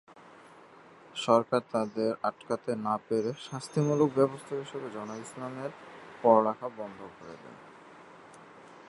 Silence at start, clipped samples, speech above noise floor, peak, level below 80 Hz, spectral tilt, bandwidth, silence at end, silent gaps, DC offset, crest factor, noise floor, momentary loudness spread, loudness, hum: 0.15 s; under 0.1%; 24 dB; -8 dBFS; -76 dBFS; -6.5 dB/octave; 11.5 kHz; 0.05 s; none; under 0.1%; 24 dB; -54 dBFS; 26 LU; -30 LUFS; none